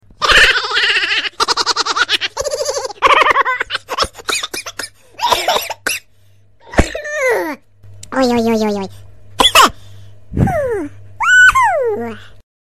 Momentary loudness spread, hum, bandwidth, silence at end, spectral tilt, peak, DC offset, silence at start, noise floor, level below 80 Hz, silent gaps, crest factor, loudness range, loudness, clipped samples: 16 LU; none; 16 kHz; 0.45 s; -2.5 dB/octave; 0 dBFS; 0.4%; 0.2 s; -52 dBFS; -34 dBFS; none; 16 dB; 6 LU; -13 LUFS; under 0.1%